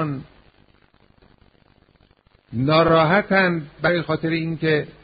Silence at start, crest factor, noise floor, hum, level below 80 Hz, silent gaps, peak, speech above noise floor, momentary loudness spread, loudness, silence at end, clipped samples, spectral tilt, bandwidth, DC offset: 0 s; 18 dB; -58 dBFS; none; -50 dBFS; none; -4 dBFS; 38 dB; 11 LU; -19 LUFS; 0.15 s; under 0.1%; -4.5 dB/octave; 5 kHz; under 0.1%